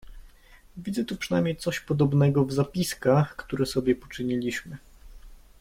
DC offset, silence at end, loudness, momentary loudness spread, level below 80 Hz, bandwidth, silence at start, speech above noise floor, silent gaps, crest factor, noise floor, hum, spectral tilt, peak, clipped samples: under 0.1%; 0.25 s; -26 LUFS; 11 LU; -50 dBFS; 16.5 kHz; 0.05 s; 27 dB; none; 18 dB; -53 dBFS; none; -6.5 dB/octave; -10 dBFS; under 0.1%